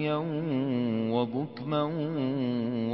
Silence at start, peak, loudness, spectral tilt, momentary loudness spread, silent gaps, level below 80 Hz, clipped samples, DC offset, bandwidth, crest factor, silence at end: 0 s; -16 dBFS; -30 LUFS; -11.5 dB/octave; 3 LU; none; -70 dBFS; under 0.1%; under 0.1%; 5.8 kHz; 14 dB; 0 s